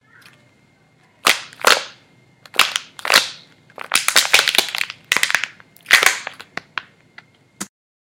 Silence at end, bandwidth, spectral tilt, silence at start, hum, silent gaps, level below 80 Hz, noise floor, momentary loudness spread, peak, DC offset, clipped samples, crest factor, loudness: 0.4 s; over 20 kHz; 1 dB/octave; 1.25 s; none; none; -64 dBFS; -55 dBFS; 21 LU; 0 dBFS; under 0.1%; under 0.1%; 20 dB; -16 LUFS